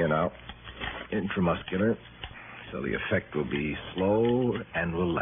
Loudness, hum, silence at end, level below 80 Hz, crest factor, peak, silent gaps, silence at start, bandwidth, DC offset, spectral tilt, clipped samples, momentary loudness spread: -29 LUFS; none; 0 s; -50 dBFS; 16 dB; -12 dBFS; none; 0 s; 3.7 kHz; under 0.1%; -4 dB/octave; under 0.1%; 16 LU